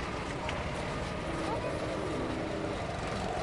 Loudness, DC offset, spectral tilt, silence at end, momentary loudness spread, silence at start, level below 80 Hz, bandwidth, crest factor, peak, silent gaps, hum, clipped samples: -35 LUFS; under 0.1%; -5.5 dB/octave; 0 s; 2 LU; 0 s; -46 dBFS; 11.5 kHz; 18 dB; -18 dBFS; none; none; under 0.1%